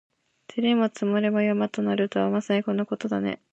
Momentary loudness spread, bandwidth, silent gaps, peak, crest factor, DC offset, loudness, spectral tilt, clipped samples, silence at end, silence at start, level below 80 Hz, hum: 5 LU; 8 kHz; none; -10 dBFS; 14 dB; under 0.1%; -25 LUFS; -6.5 dB/octave; under 0.1%; 0.15 s; 0.5 s; -70 dBFS; none